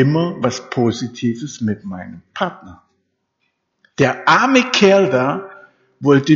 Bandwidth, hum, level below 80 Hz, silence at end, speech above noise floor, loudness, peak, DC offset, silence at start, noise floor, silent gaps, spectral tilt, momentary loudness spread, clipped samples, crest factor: 7.6 kHz; none; -58 dBFS; 0 s; 54 dB; -16 LUFS; 0 dBFS; under 0.1%; 0 s; -70 dBFS; none; -4.5 dB/octave; 16 LU; under 0.1%; 16 dB